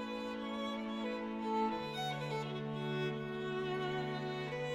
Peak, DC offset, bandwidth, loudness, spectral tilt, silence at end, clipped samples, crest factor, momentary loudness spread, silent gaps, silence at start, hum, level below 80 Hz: -26 dBFS; under 0.1%; 15 kHz; -39 LUFS; -6 dB/octave; 0 s; under 0.1%; 14 dB; 4 LU; none; 0 s; none; -68 dBFS